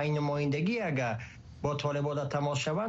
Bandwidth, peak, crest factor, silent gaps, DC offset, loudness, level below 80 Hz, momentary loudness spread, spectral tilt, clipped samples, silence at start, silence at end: 8 kHz; -16 dBFS; 14 dB; none; under 0.1%; -32 LUFS; -58 dBFS; 6 LU; -6 dB/octave; under 0.1%; 0 s; 0 s